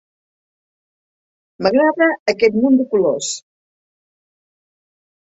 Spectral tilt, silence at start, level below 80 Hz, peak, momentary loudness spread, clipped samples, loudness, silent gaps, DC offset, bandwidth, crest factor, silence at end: -4 dB/octave; 1.6 s; -62 dBFS; -2 dBFS; 8 LU; under 0.1%; -16 LUFS; 2.20-2.26 s; under 0.1%; 8 kHz; 18 dB; 1.8 s